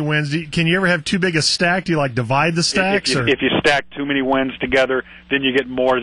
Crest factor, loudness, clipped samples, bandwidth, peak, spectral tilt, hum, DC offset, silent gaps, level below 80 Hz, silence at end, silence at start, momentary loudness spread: 14 dB; -17 LUFS; under 0.1%; 11.5 kHz; -4 dBFS; -4.5 dB/octave; none; under 0.1%; none; -46 dBFS; 0 s; 0 s; 4 LU